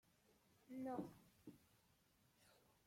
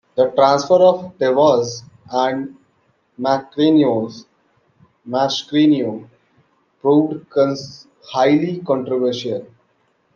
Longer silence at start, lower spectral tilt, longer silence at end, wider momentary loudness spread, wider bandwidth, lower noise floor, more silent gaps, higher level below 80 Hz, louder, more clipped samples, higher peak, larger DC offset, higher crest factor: first, 0.3 s vs 0.15 s; about the same, -7 dB/octave vs -6 dB/octave; second, 0.3 s vs 0.7 s; first, 16 LU vs 13 LU; first, 16.5 kHz vs 7.2 kHz; first, -78 dBFS vs -62 dBFS; neither; second, -86 dBFS vs -66 dBFS; second, -52 LUFS vs -17 LUFS; neither; second, -36 dBFS vs -2 dBFS; neither; first, 22 dB vs 16 dB